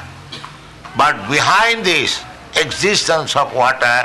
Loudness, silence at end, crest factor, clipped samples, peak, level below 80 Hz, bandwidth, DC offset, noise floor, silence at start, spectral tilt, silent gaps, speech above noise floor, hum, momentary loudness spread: -14 LUFS; 0 s; 14 dB; under 0.1%; -4 dBFS; -48 dBFS; 12 kHz; under 0.1%; -36 dBFS; 0 s; -2.5 dB/octave; none; 21 dB; none; 19 LU